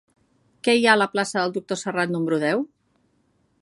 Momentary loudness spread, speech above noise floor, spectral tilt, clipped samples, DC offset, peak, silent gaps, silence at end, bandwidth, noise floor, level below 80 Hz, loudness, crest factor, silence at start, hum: 10 LU; 44 dB; -4 dB/octave; under 0.1%; under 0.1%; -2 dBFS; none; 0.95 s; 11.5 kHz; -66 dBFS; -72 dBFS; -22 LUFS; 22 dB; 0.65 s; none